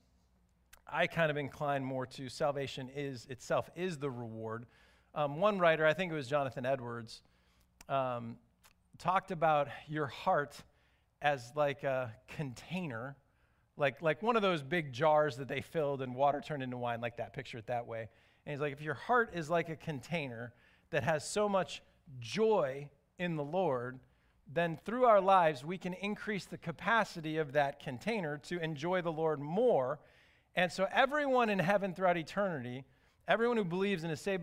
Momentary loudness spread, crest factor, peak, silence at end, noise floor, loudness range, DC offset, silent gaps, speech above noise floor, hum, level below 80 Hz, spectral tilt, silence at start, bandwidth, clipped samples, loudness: 14 LU; 22 dB; -14 dBFS; 0 s; -72 dBFS; 5 LU; under 0.1%; none; 38 dB; none; -68 dBFS; -5.5 dB/octave; 0.85 s; 15.5 kHz; under 0.1%; -34 LUFS